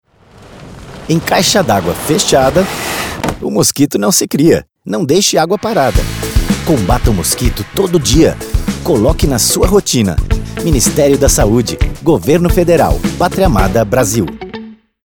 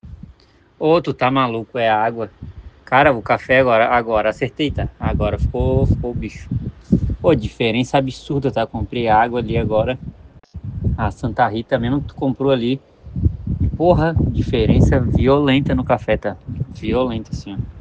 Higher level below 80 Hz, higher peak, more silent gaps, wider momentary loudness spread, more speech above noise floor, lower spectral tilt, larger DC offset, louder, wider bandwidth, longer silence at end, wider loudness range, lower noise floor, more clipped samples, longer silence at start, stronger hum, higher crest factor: first, -22 dBFS vs -30 dBFS; about the same, 0 dBFS vs 0 dBFS; neither; second, 8 LU vs 12 LU; second, 29 dB vs 33 dB; second, -4.5 dB/octave vs -7.5 dB/octave; first, 0.3% vs under 0.1%; first, -12 LUFS vs -18 LUFS; first, over 20 kHz vs 8.8 kHz; first, 0.3 s vs 0 s; about the same, 2 LU vs 4 LU; second, -40 dBFS vs -50 dBFS; neither; first, 0.4 s vs 0.05 s; neither; second, 12 dB vs 18 dB